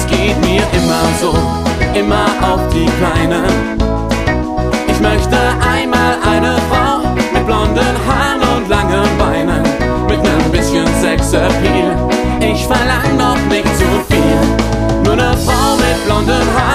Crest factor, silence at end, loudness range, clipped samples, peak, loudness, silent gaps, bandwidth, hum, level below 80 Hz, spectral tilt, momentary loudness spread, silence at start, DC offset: 12 dB; 0 s; 1 LU; under 0.1%; 0 dBFS; -12 LUFS; none; 15.5 kHz; none; -20 dBFS; -5.5 dB/octave; 3 LU; 0 s; under 0.1%